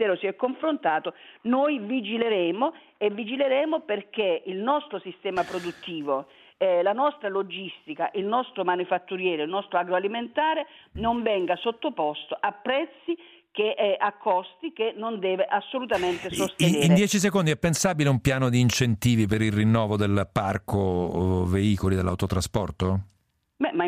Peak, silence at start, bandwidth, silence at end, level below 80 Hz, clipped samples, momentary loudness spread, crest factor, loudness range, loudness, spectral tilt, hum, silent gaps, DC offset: -6 dBFS; 0 s; 15.5 kHz; 0 s; -52 dBFS; under 0.1%; 8 LU; 20 dB; 5 LU; -26 LUFS; -5.5 dB/octave; none; none; under 0.1%